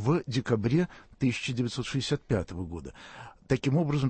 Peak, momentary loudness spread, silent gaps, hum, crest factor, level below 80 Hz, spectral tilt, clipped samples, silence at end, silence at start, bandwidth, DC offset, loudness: -12 dBFS; 16 LU; none; none; 16 dB; -52 dBFS; -6.5 dB/octave; under 0.1%; 0 s; 0 s; 8.8 kHz; under 0.1%; -30 LUFS